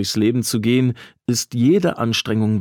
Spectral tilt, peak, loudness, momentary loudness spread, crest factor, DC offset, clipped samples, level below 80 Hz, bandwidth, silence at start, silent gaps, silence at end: -5 dB/octave; -6 dBFS; -19 LUFS; 6 LU; 12 dB; under 0.1%; under 0.1%; -58 dBFS; 19 kHz; 0 s; none; 0 s